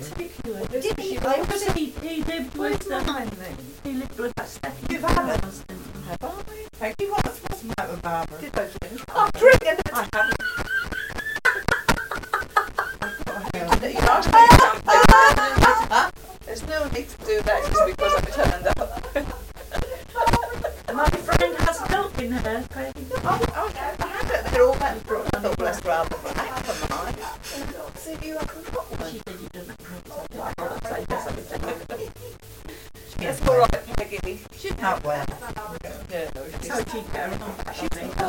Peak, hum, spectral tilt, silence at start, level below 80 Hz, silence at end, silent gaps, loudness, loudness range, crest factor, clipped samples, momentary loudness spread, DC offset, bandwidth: -2 dBFS; none; -4.5 dB/octave; 0 s; -34 dBFS; 0 s; none; -22 LUFS; 16 LU; 22 dB; under 0.1%; 18 LU; under 0.1%; 17 kHz